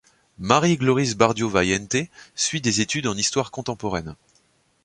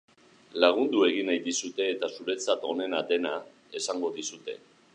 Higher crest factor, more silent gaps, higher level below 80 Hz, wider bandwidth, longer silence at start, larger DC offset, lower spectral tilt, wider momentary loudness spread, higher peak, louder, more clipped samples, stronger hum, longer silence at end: about the same, 22 dB vs 22 dB; neither; first, -50 dBFS vs -84 dBFS; about the same, 11 kHz vs 10.5 kHz; second, 0.4 s vs 0.55 s; neither; first, -4 dB/octave vs -2 dB/octave; second, 11 LU vs 15 LU; first, 0 dBFS vs -6 dBFS; first, -22 LUFS vs -28 LUFS; neither; neither; first, 0.7 s vs 0.4 s